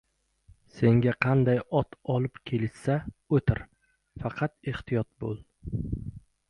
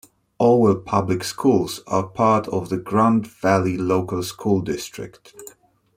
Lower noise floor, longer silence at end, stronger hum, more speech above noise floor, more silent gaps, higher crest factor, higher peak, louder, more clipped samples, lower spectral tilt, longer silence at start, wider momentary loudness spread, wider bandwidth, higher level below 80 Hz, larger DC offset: first, -60 dBFS vs -48 dBFS; second, 0.3 s vs 0.5 s; neither; first, 33 dB vs 28 dB; neither; about the same, 22 dB vs 18 dB; second, -8 dBFS vs -2 dBFS; second, -29 LUFS vs -20 LUFS; neither; first, -9 dB/octave vs -6.5 dB/octave; first, 0.75 s vs 0.4 s; about the same, 13 LU vs 11 LU; second, 10.5 kHz vs 16 kHz; first, -48 dBFS vs -56 dBFS; neither